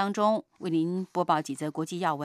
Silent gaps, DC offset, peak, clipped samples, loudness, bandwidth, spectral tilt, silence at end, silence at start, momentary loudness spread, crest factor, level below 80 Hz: none; under 0.1%; -12 dBFS; under 0.1%; -29 LUFS; 14.5 kHz; -6 dB/octave; 0 s; 0 s; 6 LU; 18 dB; -80 dBFS